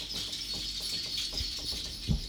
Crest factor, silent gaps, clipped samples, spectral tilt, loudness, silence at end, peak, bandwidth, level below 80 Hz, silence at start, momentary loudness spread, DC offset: 20 dB; none; under 0.1%; -2.5 dB/octave; -33 LUFS; 0 s; -16 dBFS; over 20 kHz; -42 dBFS; 0 s; 3 LU; under 0.1%